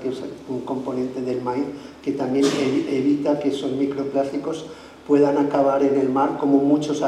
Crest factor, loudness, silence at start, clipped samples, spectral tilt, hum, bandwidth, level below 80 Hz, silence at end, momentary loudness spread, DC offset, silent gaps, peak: 16 dB; -22 LUFS; 0 s; under 0.1%; -6 dB/octave; none; 11 kHz; -60 dBFS; 0 s; 12 LU; under 0.1%; none; -6 dBFS